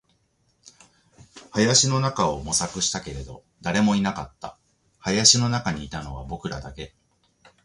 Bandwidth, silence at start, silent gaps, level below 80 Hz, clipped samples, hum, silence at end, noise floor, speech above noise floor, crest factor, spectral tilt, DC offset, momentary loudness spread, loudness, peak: 11.5 kHz; 0.65 s; none; -46 dBFS; under 0.1%; none; 0.75 s; -67 dBFS; 44 dB; 24 dB; -3 dB/octave; under 0.1%; 21 LU; -22 LUFS; -2 dBFS